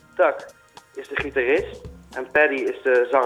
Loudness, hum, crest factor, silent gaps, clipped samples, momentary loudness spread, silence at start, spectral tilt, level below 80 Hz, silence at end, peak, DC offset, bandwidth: -21 LUFS; none; 18 dB; none; under 0.1%; 18 LU; 0.15 s; -5.5 dB/octave; -50 dBFS; 0 s; -4 dBFS; under 0.1%; 12 kHz